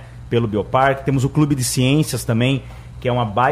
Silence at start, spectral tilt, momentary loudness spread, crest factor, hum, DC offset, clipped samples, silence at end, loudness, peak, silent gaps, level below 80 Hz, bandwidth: 0 s; -5.5 dB/octave; 6 LU; 14 dB; none; under 0.1%; under 0.1%; 0 s; -18 LUFS; -4 dBFS; none; -40 dBFS; 15.5 kHz